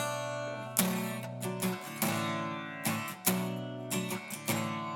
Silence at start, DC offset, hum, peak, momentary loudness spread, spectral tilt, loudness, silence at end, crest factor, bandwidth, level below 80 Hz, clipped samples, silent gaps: 0 s; under 0.1%; none; -8 dBFS; 7 LU; -4 dB/octave; -34 LUFS; 0 s; 26 dB; 19.5 kHz; -74 dBFS; under 0.1%; none